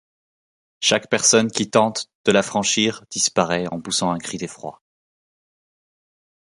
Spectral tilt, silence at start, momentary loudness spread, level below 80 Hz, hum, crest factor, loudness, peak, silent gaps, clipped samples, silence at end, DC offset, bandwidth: -2.5 dB/octave; 0.8 s; 14 LU; -60 dBFS; none; 20 dB; -19 LUFS; -2 dBFS; 2.15-2.24 s; under 0.1%; 1.8 s; under 0.1%; 11.5 kHz